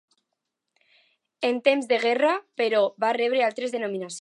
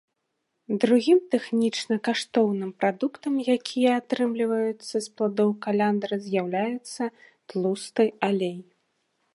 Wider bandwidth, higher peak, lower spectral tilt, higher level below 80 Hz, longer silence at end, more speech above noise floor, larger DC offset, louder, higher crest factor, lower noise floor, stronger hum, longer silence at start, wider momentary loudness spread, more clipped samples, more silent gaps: about the same, 11.5 kHz vs 11.5 kHz; about the same, -6 dBFS vs -6 dBFS; second, -3.5 dB/octave vs -5.5 dB/octave; about the same, -82 dBFS vs -78 dBFS; second, 0 s vs 0.7 s; first, 58 dB vs 54 dB; neither; about the same, -24 LUFS vs -25 LUFS; about the same, 20 dB vs 18 dB; first, -82 dBFS vs -78 dBFS; neither; first, 1.4 s vs 0.7 s; about the same, 7 LU vs 9 LU; neither; neither